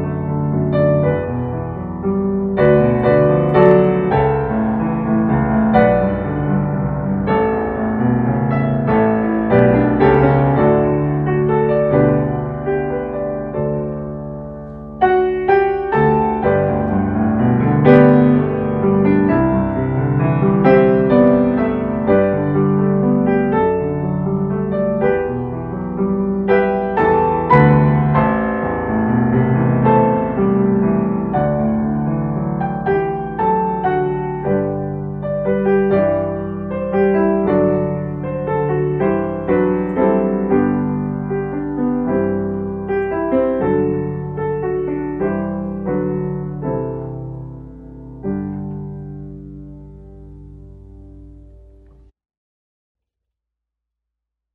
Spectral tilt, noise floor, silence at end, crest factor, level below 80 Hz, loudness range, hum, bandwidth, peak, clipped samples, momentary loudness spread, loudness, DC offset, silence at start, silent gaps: -11.5 dB/octave; -82 dBFS; 3.2 s; 16 dB; -38 dBFS; 8 LU; none; 4.5 kHz; 0 dBFS; under 0.1%; 11 LU; -16 LUFS; under 0.1%; 0 s; none